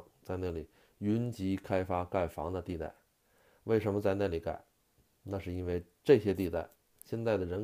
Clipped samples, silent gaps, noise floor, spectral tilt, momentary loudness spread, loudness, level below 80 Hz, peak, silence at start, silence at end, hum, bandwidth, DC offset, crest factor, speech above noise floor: under 0.1%; none; -71 dBFS; -8 dB/octave; 15 LU; -34 LUFS; -56 dBFS; -12 dBFS; 0 s; 0 s; none; 15.5 kHz; under 0.1%; 22 dB; 38 dB